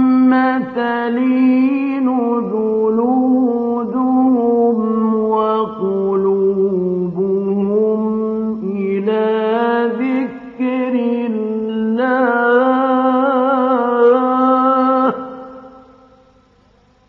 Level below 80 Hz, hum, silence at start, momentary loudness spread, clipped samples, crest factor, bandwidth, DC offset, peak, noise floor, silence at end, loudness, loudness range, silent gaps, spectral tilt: -60 dBFS; none; 0 s; 7 LU; under 0.1%; 14 dB; 4.7 kHz; under 0.1%; -2 dBFS; -52 dBFS; 1.3 s; -15 LUFS; 4 LU; none; -9.5 dB/octave